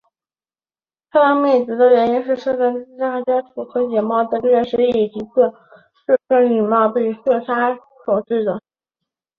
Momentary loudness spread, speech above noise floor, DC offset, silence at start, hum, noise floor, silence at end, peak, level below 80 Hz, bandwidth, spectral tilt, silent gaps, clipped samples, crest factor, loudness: 8 LU; over 74 dB; under 0.1%; 1.15 s; none; under -90 dBFS; 0.8 s; -2 dBFS; -62 dBFS; 5 kHz; -7.5 dB/octave; none; under 0.1%; 16 dB; -17 LUFS